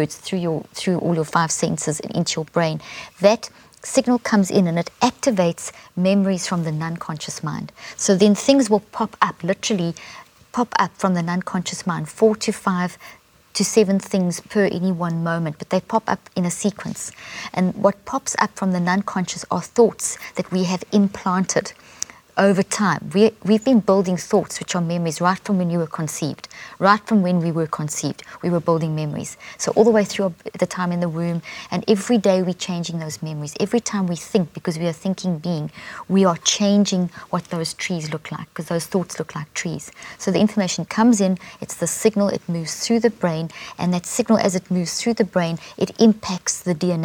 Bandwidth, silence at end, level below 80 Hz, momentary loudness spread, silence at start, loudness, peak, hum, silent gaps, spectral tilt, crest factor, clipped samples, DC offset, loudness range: 18 kHz; 0 s; -60 dBFS; 11 LU; 0 s; -21 LUFS; 0 dBFS; none; none; -5 dB/octave; 20 dB; under 0.1%; under 0.1%; 3 LU